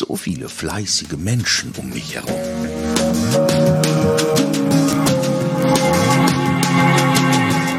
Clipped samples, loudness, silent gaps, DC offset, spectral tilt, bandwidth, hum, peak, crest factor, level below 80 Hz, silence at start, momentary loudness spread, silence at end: under 0.1%; -17 LUFS; none; under 0.1%; -4.5 dB/octave; 17 kHz; none; -2 dBFS; 14 dB; -44 dBFS; 0 s; 10 LU; 0 s